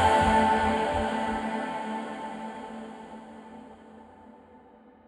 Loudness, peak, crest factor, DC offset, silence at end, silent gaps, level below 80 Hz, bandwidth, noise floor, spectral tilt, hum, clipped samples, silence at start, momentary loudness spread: -27 LUFS; -10 dBFS; 18 dB; under 0.1%; 0.5 s; none; -46 dBFS; 12.5 kHz; -54 dBFS; -5 dB/octave; none; under 0.1%; 0 s; 24 LU